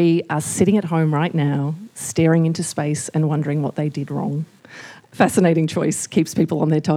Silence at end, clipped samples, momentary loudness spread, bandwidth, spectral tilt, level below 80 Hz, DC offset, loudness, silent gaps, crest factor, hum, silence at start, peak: 0 s; under 0.1%; 11 LU; 15 kHz; -6 dB/octave; -60 dBFS; under 0.1%; -20 LUFS; none; 18 dB; none; 0 s; 0 dBFS